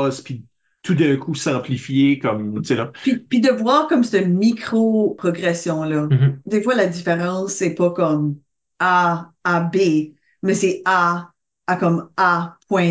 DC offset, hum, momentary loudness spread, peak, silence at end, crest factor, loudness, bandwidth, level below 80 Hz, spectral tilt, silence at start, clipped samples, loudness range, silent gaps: under 0.1%; none; 7 LU; -4 dBFS; 0 s; 14 dB; -19 LUFS; 8 kHz; -64 dBFS; -6 dB/octave; 0 s; under 0.1%; 2 LU; none